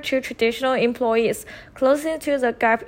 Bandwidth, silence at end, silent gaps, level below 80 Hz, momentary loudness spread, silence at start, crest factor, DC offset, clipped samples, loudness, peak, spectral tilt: 16.5 kHz; 0 s; none; -54 dBFS; 5 LU; 0 s; 14 dB; under 0.1%; under 0.1%; -21 LUFS; -6 dBFS; -4 dB/octave